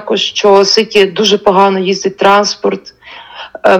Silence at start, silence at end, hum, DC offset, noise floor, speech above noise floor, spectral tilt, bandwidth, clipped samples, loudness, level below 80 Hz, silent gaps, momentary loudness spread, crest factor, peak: 0 s; 0 s; none; under 0.1%; -30 dBFS; 21 dB; -3.5 dB/octave; 10.5 kHz; 1%; -10 LUFS; -52 dBFS; none; 15 LU; 10 dB; 0 dBFS